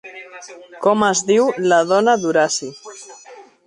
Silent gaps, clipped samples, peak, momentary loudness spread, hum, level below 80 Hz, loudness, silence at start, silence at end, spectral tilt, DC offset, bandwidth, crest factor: none; under 0.1%; -2 dBFS; 22 LU; none; -64 dBFS; -16 LUFS; 0.05 s; 0.25 s; -3.5 dB/octave; under 0.1%; 11 kHz; 16 dB